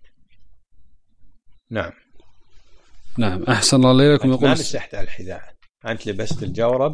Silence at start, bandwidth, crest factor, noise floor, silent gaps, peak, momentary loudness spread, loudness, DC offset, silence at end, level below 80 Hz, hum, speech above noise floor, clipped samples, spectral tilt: 0 s; 10.5 kHz; 20 dB; -47 dBFS; none; 0 dBFS; 20 LU; -18 LUFS; under 0.1%; 0 s; -42 dBFS; none; 29 dB; under 0.1%; -5 dB/octave